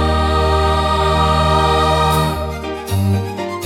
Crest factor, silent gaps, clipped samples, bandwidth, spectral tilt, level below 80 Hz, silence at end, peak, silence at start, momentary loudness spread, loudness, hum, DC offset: 12 dB; none; under 0.1%; 16 kHz; -5.5 dB/octave; -26 dBFS; 0 s; -2 dBFS; 0 s; 9 LU; -16 LUFS; none; under 0.1%